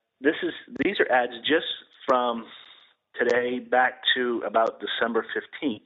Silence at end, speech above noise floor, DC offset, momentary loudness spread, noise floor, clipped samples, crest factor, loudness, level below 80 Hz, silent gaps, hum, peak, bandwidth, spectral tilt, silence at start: 0.05 s; 29 dB; under 0.1%; 10 LU; -55 dBFS; under 0.1%; 18 dB; -25 LUFS; -70 dBFS; none; none; -8 dBFS; 7.2 kHz; -0.5 dB/octave; 0.2 s